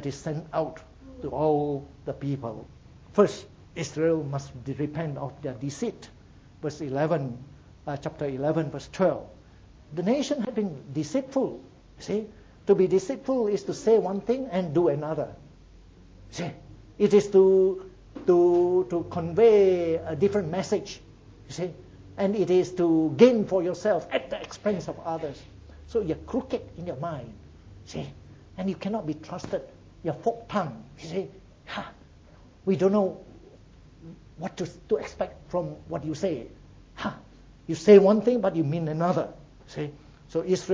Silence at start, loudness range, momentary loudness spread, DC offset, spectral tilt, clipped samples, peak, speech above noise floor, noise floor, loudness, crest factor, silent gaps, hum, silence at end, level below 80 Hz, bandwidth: 0 s; 10 LU; 18 LU; under 0.1%; -7 dB/octave; under 0.1%; -4 dBFS; 27 dB; -52 dBFS; -26 LUFS; 22 dB; none; none; 0 s; -54 dBFS; 8 kHz